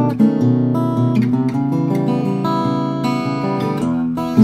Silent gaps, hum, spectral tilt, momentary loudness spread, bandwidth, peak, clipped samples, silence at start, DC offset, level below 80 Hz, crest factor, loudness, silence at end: none; none; -8.5 dB/octave; 4 LU; 13 kHz; 0 dBFS; under 0.1%; 0 s; under 0.1%; -52 dBFS; 16 dB; -17 LUFS; 0 s